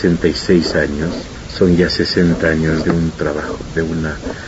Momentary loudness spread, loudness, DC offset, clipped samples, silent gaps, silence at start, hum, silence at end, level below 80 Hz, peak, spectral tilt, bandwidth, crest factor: 9 LU; -16 LUFS; under 0.1%; under 0.1%; none; 0 s; none; 0 s; -32 dBFS; 0 dBFS; -6 dB/octave; 8 kHz; 14 dB